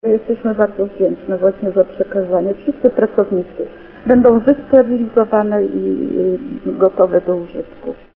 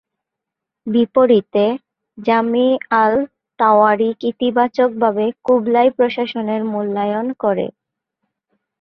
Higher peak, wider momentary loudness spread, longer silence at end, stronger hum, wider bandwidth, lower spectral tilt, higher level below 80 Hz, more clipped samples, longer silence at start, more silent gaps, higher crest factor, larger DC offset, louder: about the same, 0 dBFS vs -2 dBFS; first, 13 LU vs 8 LU; second, 0.2 s vs 1.1 s; neither; second, 3.7 kHz vs 5.8 kHz; first, -11 dB/octave vs -8 dB/octave; first, -46 dBFS vs -62 dBFS; neither; second, 0.05 s vs 0.85 s; neither; about the same, 16 dB vs 16 dB; neither; about the same, -15 LUFS vs -16 LUFS